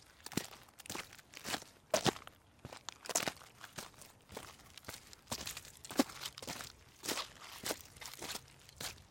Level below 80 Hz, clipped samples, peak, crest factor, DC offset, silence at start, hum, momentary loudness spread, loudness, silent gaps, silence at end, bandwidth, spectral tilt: -68 dBFS; under 0.1%; -14 dBFS; 30 dB; under 0.1%; 0 s; none; 16 LU; -42 LUFS; none; 0 s; 17 kHz; -2.5 dB/octave